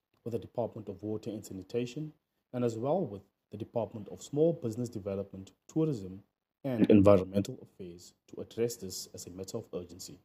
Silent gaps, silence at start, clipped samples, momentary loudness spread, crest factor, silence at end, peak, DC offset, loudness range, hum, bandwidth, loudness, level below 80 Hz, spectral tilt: none; 0.25 s; under 0.1%; 20 LU; 24 dB; 0.1 s; -10 dBFS; under 0.1%; 7 LU; none; 15.5 kHz; -33 LUFS; -70 dBFS; -7 dB/octave